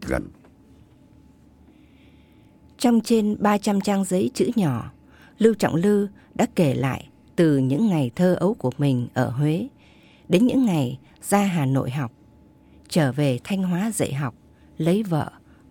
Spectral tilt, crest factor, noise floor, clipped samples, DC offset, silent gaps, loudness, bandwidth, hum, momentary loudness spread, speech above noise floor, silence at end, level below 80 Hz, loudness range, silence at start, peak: -6.5 dB/octave; 20 dB; -52 dBFS; under 0.1%; under 0.1%; none; -22 LUFS; 17.5 kHz; none; 10 LU; 31 dB; 0.4 s; -52 dBFS; 3 LU; 0 s; -4 dBFS